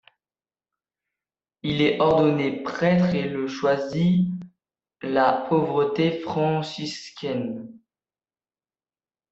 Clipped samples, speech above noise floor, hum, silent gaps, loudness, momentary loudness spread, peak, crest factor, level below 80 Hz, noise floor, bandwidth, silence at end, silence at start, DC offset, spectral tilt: under 0.1%; over 68 dB; none; none; -23 LUFS; 12 LU; -6 dBFS; 18 dB; -60 dBFS; under -90 dBFS; 7.8 kHz; 1.55 s; 1.65 s; under 0.1%; -7 dB/octave